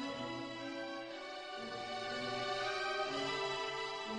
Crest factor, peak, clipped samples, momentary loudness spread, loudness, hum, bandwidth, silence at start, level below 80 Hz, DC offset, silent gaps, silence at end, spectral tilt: 16 dB; -26 dBFS; under 0.1%; 8 LU; -40 LUFS; none; 10.5 kHz; 0 s; -72 dBFS; under 0.1%; none; 0 s; -3 dB/octave